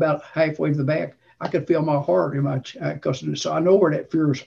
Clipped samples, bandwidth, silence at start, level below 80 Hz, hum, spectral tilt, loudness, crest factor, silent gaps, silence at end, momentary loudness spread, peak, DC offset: under 0.1%; 7.6 kHz; 0 s; -62 dBFS; none; -7 dB/octave; -22 LUFS; 16 dB; none; 0.05 s; 8 LU; -4 dBFS; under 0.1%